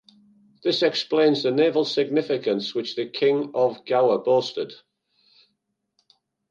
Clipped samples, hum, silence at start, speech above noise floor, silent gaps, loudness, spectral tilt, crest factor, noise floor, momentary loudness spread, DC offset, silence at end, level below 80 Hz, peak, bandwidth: under 0.1%; none; 0.65 s; 54 dB; none; -22 LUFS; -5.5 dB/octave; 18 dB; -76 dBFS; 9 LU; under 0.1%; 1.75 s; -76 dBFS; -6 dBFS; 7.4 kHz